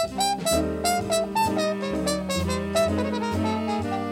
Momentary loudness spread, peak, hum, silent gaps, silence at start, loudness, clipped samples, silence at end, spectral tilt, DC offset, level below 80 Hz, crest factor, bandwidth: 3 LU; -10 dBFS; none; none; 0 s; -25 LUFS; under 0.1%; 0 s; -4.5 dB/octave; under 0.1%; -44 dBFS; 16 dB; 16.5 kHz